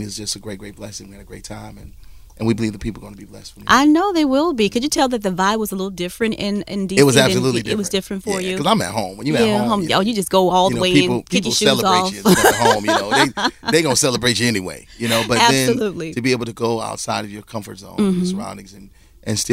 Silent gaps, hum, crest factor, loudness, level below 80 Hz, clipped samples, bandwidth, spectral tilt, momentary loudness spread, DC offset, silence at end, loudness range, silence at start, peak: none; none; 18 dB; -17 LUFS; -44 dBFS; under 0.1%; 16 kHz; -4 dB/octave; 19 LU; under 0.1%; 0 s; 7 LU; 0 s; 0 dBFS